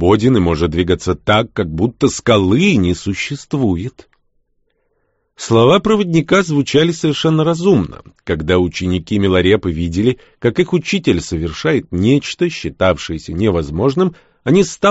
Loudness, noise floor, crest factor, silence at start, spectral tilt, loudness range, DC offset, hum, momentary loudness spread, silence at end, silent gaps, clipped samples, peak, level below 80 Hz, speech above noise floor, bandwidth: -15 LUFS; -64 dBFS; 14 dB; 0 s; -5.5 dB/octave; 3 LU; under 0.1%; none; 8 LU; 0 s; none; under 0.1%; 0 dBFS; -36 dBFS; 50 dB; 8 kHz